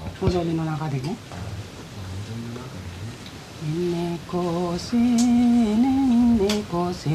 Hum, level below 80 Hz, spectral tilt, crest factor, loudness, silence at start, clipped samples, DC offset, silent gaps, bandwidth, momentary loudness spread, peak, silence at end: none; -44 dBFS; -6.5 dB/octave; 14 dB; -23 LUFS; 0 s; under 0.1%; under 0.1%; none; 13.5 kHz; 17 LU; -8 dBFS; 0 s